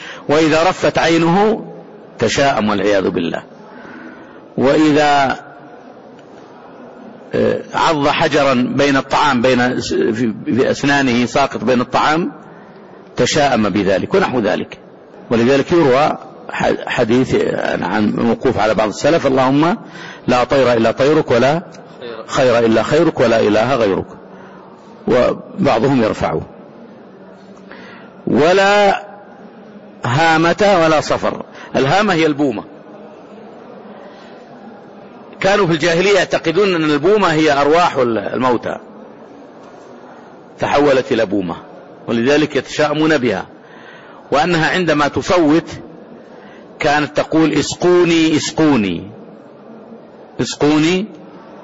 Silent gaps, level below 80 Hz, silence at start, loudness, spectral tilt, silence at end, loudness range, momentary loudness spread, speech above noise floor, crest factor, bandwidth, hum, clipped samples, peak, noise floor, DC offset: none; -46 dBFS; 0 s; -14 LUFS; -5 dB/octave; 0 s; 5 LU; 16 LU; 25 dB; 10 dB; 8 kHz; none; under 0.1%; -4 dBFS; -38 dBFS; under 0.1%